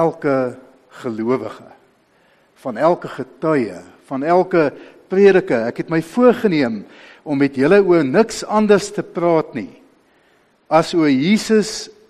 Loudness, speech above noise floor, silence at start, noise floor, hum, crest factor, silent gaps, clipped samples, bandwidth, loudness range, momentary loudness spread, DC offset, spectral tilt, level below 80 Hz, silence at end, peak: -17 LUFS; 40 dB; 0 s; -57 dBFS; none; 16 dB; none; under 0.1%; 13 kHz; 7 LU; 16 LU; under 0.1%; -6 dB/octave; -58 dBFS; 0.2 s; 0 dBFS